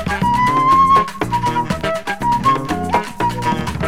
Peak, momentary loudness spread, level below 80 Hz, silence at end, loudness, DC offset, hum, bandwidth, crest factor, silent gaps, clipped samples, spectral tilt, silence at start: -4 dBFS; 8 LU; -36 dBFS; 0 s; -16 LUFS; 1%; none; 16.5 kHz; 14 dB; none; under 0.1%; -5.5 dB/octave; 0 s